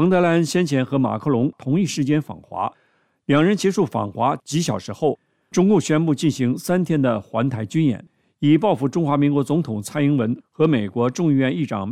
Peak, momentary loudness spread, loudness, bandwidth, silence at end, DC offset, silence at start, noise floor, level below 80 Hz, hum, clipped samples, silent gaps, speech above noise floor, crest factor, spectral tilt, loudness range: -4 dBFS; 8 LU; -20 LUFS; 15 kHz; 0 s; under 0.1%; 0 s; -52 dBFS; -60 dBFS; none; under 0.1%; none; 32 dB; 16 dB; -6.5 dB/octave; 2 LU